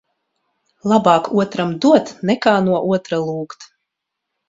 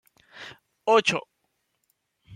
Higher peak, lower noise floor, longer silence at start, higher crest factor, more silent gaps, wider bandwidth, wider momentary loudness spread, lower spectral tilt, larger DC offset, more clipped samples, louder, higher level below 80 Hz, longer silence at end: first, 0 dBFS vs -6 dBFS; first, -79 dBFS vs -75 dBFS; first, 0.85 s vs 0.35 s; about the same, 18 dB vs 22 dB; neither; second, 7.8 kHz vs 10.5 kHz; second, 11 LU vs 23 LU; first, -6.5 dB/octave vs -3 dB/octave; neither; neither; first, -17 LUFS vs -23 LUFS; first, -60 dBFS vs -70 dBFS; first, 0.85 s vs 0 s